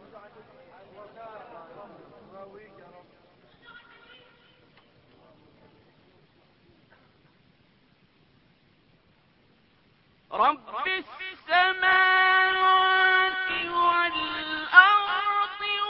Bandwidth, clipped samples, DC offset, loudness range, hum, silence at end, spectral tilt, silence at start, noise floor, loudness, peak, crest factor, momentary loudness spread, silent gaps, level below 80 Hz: 5.8 kHz; under 0.1%; under 0.1%; 12 LU; none; 0 s; -5.5 dB/octave; 0.15 s; -63 dBFS; -22 LUFS; 0 dBFS; 26 dB; 26 LU; none; -66 dBFS